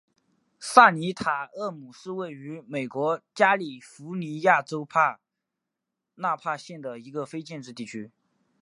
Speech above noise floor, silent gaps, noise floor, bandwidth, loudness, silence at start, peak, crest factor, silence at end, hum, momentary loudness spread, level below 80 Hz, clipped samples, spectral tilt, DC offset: 59 dB; none; -85 dBFS; 11.5 kHz; -25 LUFS; 0.6 s; -2 dBFS; 26 dB; 0.55 s; none; 19 LU; -72 dBFS; under 0.1%; -4.5 dB/octave; under 0.1%